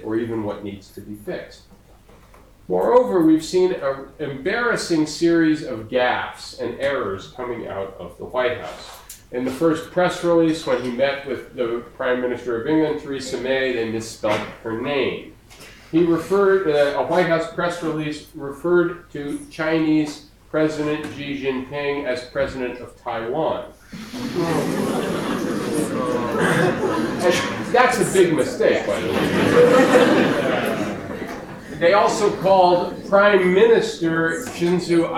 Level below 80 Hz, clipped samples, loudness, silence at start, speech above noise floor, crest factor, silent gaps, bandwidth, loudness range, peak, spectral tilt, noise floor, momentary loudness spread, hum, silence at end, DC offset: -50 dBFS; under 0.1%; -20 LUFS; 0 s; 28 dB; 18 dB; none; 16 kHz; 8 LU; -2 dBFS; -5.5 dB/octave; -48 dBFS; 14 LU; none; 0 s; under 0.1%